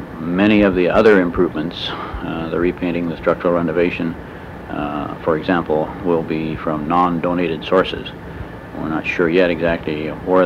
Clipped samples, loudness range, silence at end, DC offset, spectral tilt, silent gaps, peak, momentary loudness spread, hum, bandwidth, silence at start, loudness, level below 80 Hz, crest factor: under 0.1%; 4 LU; 0 s; under 0.1%; -7.5 dB/octave; none; -2 dBFS; 14 LU; none; 12 kHz; 0 s; -18 LUFS; -40 dBFS; 14 dB